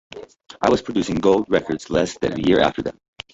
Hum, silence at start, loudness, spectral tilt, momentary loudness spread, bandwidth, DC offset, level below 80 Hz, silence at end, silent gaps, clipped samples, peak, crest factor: none; 0.15 s; -20 LUFS; -5.5 dB/octave; 15 LU; 8 kHz; under 0.1%; -46 dBFS; 0.4 s; none; under 0.1%; -2 dBFS; 18 dB